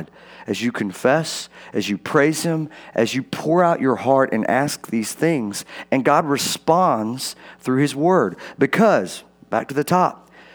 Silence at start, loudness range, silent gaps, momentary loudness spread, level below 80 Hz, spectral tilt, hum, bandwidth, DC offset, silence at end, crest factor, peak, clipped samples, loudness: 0 s; 1 LU; none; 11 LU; -66 dBFS; -5 dB/octave; none; over 20 kHz; under 0.1%; 0.4 s; 18 dB; -2 dBFS; under 0.1%; -20 LUFS